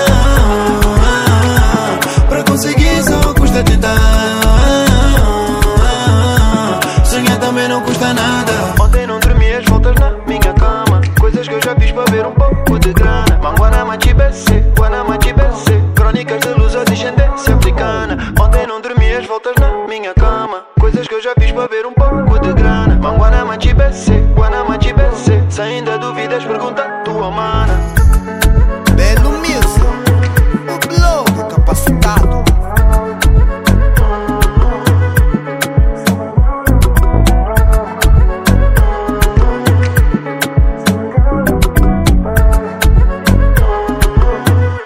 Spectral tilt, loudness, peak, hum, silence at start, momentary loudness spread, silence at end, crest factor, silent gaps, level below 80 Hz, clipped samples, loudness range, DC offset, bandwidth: -5.5 dB/octave; -12 LUFS; 0 dBFS; none; 0 s; 4 LU; 0 s; 10 dB; none; -12 dBFS; 0.1%; 3 LU; under 0.1%; 16.5 kHz